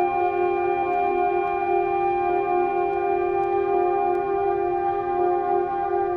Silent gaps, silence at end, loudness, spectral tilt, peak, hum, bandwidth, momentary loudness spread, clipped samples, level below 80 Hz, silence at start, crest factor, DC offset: none; 0 s; -23 LUFS; -8.5 dB/octave; -10 dBFS; none; 4.6 kHz; 2 LU; under 0.1%; -52 dBFS; 0 s; 12 dB; under 0.1%